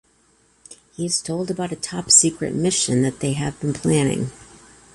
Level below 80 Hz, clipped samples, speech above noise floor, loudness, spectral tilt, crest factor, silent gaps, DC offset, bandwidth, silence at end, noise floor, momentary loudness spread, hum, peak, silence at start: -52 dBFS; under 0.1%; 39 dB; -20 LUFS; -3.5 dB/octave; 22 dB; none; under 0.1%; 11.5 kHz; 0.5 s; -59 dBFS; 14 LU; none; 0 dBFS; 0.7 s